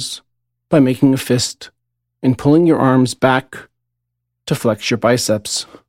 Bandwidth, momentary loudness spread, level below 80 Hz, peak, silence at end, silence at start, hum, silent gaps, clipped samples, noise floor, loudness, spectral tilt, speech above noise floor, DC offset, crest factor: 16 kHz; 17 LU; -52 dBFS; 0 dBFS; 0.25 s; 0 s; 60 Hz at -45 dBFS; none; under 0.1%; -75 dBFS; -15 LUFS; -5 dB/octave; 60 dB; under 0.1%; 16 dB